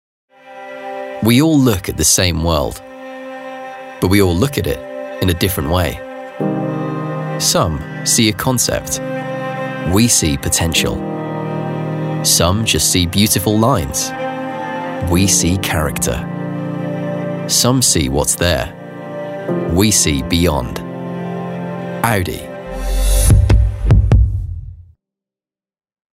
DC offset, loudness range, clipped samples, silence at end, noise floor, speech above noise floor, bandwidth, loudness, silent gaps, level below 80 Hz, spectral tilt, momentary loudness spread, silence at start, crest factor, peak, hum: under 0.1%; 3 LU; under 0.1%; 1.35 s; under -90 dBFS; over 76 dB; 16 kHz; -15 LUFS; none; -24 dBFS; -4 dB/octave; 15 LU; 0.45 s; 16 dB; 0 dBFS; none